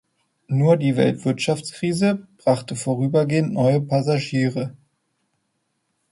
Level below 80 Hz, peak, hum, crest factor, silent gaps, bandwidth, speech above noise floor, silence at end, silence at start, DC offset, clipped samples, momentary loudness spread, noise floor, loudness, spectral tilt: -60 dBFS; -4 dBFS; none; 18 dB; none; 11.5 kHz; 53 dB; 1.4 s; 0.5 s; under 0.1%; under 0.1%; 7 LU; -73 dBFS; -21 LUFS; -6.5 dB/octave